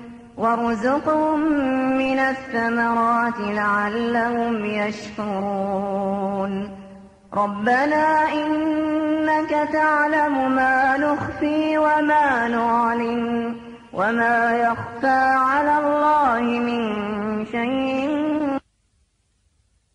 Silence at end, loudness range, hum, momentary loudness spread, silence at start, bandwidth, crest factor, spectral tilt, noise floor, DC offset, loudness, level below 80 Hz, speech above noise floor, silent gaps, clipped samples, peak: 1.35 s; 5 LU; none; 8 LU; 0 s; 10.5 kHz; 14 dB; -6 dB/octave; -66 dBFS; under 0.1%; -20 LUFS; -54 dBFS; 45 dB; none; under 0.1%; -8 dBFS